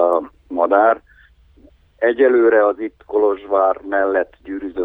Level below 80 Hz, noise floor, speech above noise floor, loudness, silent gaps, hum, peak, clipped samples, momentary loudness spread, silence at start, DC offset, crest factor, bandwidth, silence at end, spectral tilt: -54 dBFS; -50 dBFS; 34 dB; -17 LUFS; none; 50 Hz at -60 dBFS; -2 dBFS; under 0.1%; 14 LU; 0 s; under 0.1%; 16 dB; 3.9 kHz; 0 s; -7.5 dB/octave